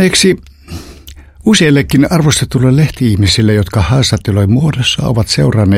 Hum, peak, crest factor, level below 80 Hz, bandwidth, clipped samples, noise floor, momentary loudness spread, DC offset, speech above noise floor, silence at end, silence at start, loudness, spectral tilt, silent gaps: none; 0 dBFS; 10 dB; -30 dBFS; 16 kHz; under 0.1%; -34 dBFS; 8 LU; under 0.1%; 24 dB; 0 s; 0 s; -10 LUFS; -5 dB/octave; none